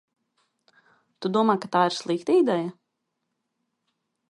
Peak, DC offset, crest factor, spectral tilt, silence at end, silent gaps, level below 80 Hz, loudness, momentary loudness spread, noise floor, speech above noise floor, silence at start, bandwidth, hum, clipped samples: -8 dBFS; under 0.1%; 20 dB; -5.5 dB/octave; 1.6 s; none; -78 dBFS; -24 LUFS; 9 LU; -79 dBFS; 57 dB; 1.2 s; 11.5 kHz; none; under 0.1%